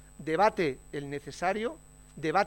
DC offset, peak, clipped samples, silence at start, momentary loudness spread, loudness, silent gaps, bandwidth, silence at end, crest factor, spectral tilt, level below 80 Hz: under 0.1%; -12 dBFS; under 0.1%; 0.2 s; 13 LU; -31 LUFS; none; 16.5 kHz; 0 s; 20 dB; -5.5 dB/octave; -56 dBFS